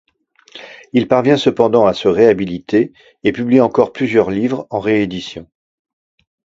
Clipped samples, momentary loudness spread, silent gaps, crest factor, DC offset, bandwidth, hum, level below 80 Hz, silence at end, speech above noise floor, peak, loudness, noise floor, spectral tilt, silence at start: under 0.1%; 14 LU; none; 16 dB; under 0.1%; 7.8 kHz; none; -50 dBFS; 1.15 s; 38 dB; 0 dBFS; -15 LUFS; -52 dBFS; -7 dB/octave; 0.55 s